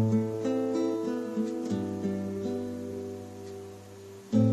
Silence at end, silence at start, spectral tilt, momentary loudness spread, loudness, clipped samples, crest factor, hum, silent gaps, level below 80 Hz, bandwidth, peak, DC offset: 0 s; 0 s; -8 dB/octave; 15 LU; -32 LUFS; under 0.1%; 18 dB; none; none; -60 dBFS; 13.5 kHz; -12 dBFS; under 0.1%